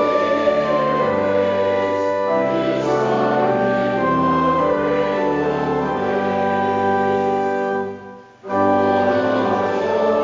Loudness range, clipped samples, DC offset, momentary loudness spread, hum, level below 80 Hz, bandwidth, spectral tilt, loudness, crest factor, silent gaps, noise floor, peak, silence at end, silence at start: 2 LU; under 0.1%; under 0.1%; 4 LU; none; -48 dBFS; 7.6 kHz; -7 dB/octave; -18 LUFS; 14 dB; none; -38 dBFS; -4 dBFS; 0 s; 0 s